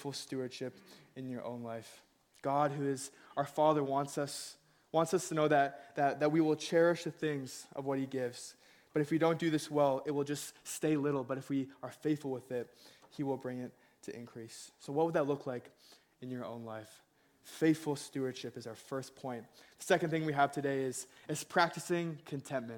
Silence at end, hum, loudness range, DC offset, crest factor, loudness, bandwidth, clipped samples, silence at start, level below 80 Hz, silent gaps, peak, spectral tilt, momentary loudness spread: 0 s; none; 7 LU; under 0.1%; 22 dB; -35 LUFS; 18 kHz; under 0.1%; 0 s; -78 dBFS; none; -14 dBFS; -5.5 dB/octave; 17 LU